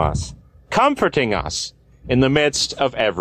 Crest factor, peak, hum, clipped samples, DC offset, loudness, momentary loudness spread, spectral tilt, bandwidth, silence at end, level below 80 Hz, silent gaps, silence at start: 16 dB; -4 dBFS; none; under 0.1%; under 0.1%; -19 LUFS; 11 LU; -4.5 dB/octave; 14 kHz; 0 s; -36 dBFS; none; 0 s